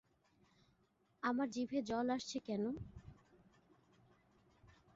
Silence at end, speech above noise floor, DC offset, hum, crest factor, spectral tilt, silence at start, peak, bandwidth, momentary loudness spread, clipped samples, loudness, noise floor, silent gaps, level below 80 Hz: 0.3 s; 37 dB; under 0.1%; none; 20 dB; -4.5 dB/octave; 1.25 s; -26 dBFS; 7.6 kHz; 11 LU; under 0.1%; -41 LUFS; -77 dBFS; none; -70 dBFS